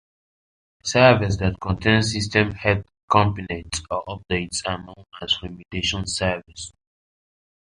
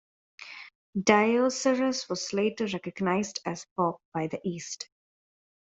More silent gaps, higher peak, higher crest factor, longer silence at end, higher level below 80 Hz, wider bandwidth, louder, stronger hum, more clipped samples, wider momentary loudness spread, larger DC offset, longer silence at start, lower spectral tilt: second, 3.03-3.08 s vs 0.75-0.93 s, 3.71-3.76 s, 4.05-4.12 s; first, -2 dBFS vs -6 dBFS; about the same, 22 dB vs 22 dB; first, 1.1 s vs 0.75 s; first, -42 dBFS vs -70 dBFS; first, 11 kHz vs 8.2 kHz; first, -22 LUFS vs -28 LUFS; neither; neither; second, 16 LU vs 20 LU; neither; first, 0.85 s vs 0.4 s; about the same, -4.5 dB/octave vs -4.5 dB/octave